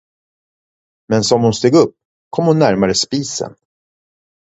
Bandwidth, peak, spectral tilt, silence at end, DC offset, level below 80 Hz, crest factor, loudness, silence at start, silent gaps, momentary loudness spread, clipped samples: 8.2 kHz; 0 dBFS; -5 dB/octave; 0.9 s; under 0.1%; -50 dBFS; 16 dB; -15 LUFS; 1.1 s; 2.05-2.31 s; 11 LU; under 0.1%